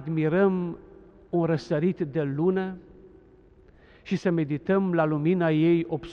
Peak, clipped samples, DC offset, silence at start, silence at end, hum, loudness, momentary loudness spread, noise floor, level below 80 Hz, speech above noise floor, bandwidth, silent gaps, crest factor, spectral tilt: -10 dBFS; under 0.1%; under 0.1%; 0 s; 0 s; none; -25 LUFS; 9 LU; -54 dBFS; -58 dBFS; 30 dB; 7 kHz; none; 16 dB; -9 dB/octave